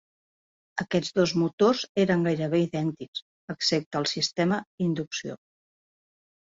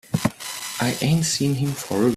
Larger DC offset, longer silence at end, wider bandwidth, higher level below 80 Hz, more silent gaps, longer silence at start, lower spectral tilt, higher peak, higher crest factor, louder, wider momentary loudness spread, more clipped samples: neither; first, 1.25 s vs 0 s; second, 7.8 kHz vs 16 kHz; second, -64 dBFS vs -52 dBFS; first, 1.53-1.58 s, 1.89-1.95 s, 3.08-3.13 s, 3.22-3.48 s, 3.86-3.91 s, 4.67-4.78 s vs none; first, 0.75 s vs 0.1 s; about the same, -5 dB/octave vs -4.5 dB/octave; second, -10 dBFS vs -4 dBFS; about the same, 18 dB vs 18 dB; second, -26 LUFS vs -23 LUFS; first, 14 LU vs 7 LU; neither